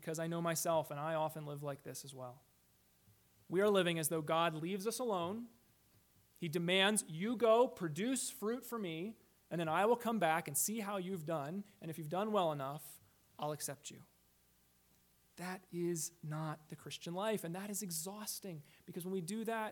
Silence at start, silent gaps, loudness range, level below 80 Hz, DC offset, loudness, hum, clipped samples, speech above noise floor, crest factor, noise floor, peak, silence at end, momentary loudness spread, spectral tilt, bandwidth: 0 s; none; 9 LU; -82 dBFS; under 0.1%; -38 LUFS; none; under 0.1%; 34 dB; 20 dB; -72 dBFS; -18 dBFS; 0 s; 16 LU; -4 dB/octave; 19 kHz